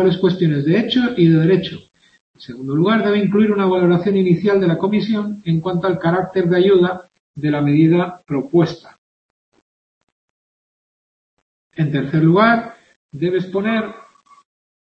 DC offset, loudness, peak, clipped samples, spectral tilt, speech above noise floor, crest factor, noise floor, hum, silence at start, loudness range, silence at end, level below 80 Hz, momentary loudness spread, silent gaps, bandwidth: under 0.1%; -16 LUFS; -2 dBFS; under 0.1%; -9 dB/octave; over 74 dB; 16 dB; under -90 dBFS; none; 0 s; 7 LU; 0.85 s; -56 dBFS; 11 LU; 2.21-2.34 s, 7.20-7.34 s, 8.98-9.52 s, 9.62-11.71 s, 12.96-13.09 s; 6.2 kHz